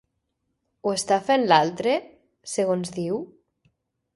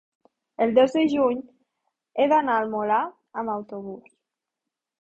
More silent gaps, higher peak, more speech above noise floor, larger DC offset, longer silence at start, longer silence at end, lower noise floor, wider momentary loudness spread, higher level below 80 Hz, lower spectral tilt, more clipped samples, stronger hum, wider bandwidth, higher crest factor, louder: neither; about the same, -4 dBFS vs -6 dBFS; second, 54 dB vs 63 dB; neither; first, 0.85 s vs 0.6 s; second, 0.9 s vs 1.05 s; second, -77 dBFS vs -86 dBFS; second, 13 LU vs 17 LU; about the same, -68 dBFS vs -68 dBFS; second, -4 dB/octave vs -6 dB/octave; neither; neither; first, 11.5 kHz vs 8 kHz; about the same, 22 dB vs 18 dB; about the same, -24 LUFS vs -23 LUFS